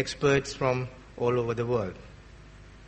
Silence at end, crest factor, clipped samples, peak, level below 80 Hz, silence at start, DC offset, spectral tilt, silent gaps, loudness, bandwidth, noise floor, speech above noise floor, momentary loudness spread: 0 s; 20 dB; under 0.1%; -10 dBFS; -50 dBFS; 0 s; under 0.1%; -5.5 dB/octave; none; -28 LUFS; 8.4 kHz; -49 dBFS; 22 dB; 13 LU